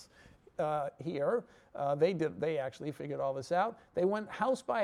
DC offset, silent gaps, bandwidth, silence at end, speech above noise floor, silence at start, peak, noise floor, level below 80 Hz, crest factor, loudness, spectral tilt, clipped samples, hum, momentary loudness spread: under 0.1%; none; 12 kHz; 0 s; 27 dB; 0 s; -18 dBFS; -60 dBFS; -72 dBFS; 16 dB; -34 LUFS; -6.5 dB/octave; under 0.1%; none; 8 LU